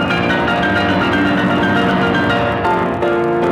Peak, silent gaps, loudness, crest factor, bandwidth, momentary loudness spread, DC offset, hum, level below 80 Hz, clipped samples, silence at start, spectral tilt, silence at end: -4 dBFS; none; -15 LUFS; 12 dB; 13.5 kHz; 2 LU; under 0.1%; none; -38 dBFS; under 0.1%; 0 s; -6.5 dB/octave; 0 s